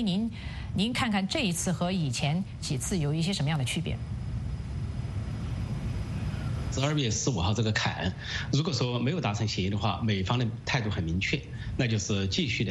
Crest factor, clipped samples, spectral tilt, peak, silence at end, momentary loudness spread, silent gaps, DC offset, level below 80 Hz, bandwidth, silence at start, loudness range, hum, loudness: 18 dB; under 0.1%; -5 dB/octave; -10 dBFS; 0 s; 7 LU; none; under 0.1%; -42 dBFS; 12.5 kHz; 0 s; 4 LU; none; -30 LUFS